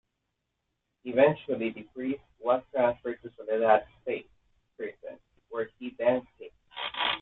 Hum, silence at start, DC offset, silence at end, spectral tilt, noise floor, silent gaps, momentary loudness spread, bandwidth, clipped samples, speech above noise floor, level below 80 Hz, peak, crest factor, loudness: none; 1.05 s; under 0.1%; 0 s; -8 dB/octave; -82 dBFS; none; 18 LU; 4.3 kHz; under 0.1%; 53 dB; -68 dBFS; -8 dBFS; 22 dB; -29 LUFS